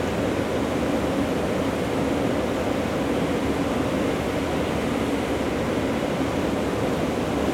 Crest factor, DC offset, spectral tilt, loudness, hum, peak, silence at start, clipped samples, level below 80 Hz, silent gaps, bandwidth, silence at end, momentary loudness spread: 12 dB; under 0.1%; -6 dB/octave; -24 LUFS; none; -12 dBFS; 0 s; under 0.1%; -42 dBFS; none; 17 kHz; 0 s; 1 LU